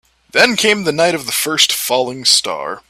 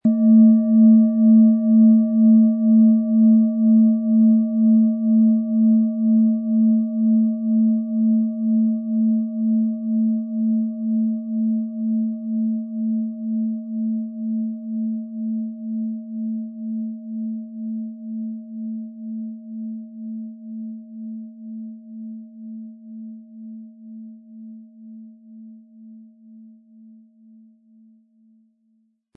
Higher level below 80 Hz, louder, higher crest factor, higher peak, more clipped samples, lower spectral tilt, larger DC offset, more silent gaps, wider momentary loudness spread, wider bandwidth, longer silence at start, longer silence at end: first, -56 dBFS vs -82 dBFS; first, -13 LUFS vs -19 LUFS; about the same, 16 dB vs 14 dB; first, 0 dBFS vs -6 dBFS; neither; second, -1.5 dB/octave vs -16 dB/octave; neither; neither; second, 6 LU vs 21 LU; first, 19 kHz vs 1.2 kHz; first, 0.35 s vs 0.05 s; second, 0.1 s vs 2.75 s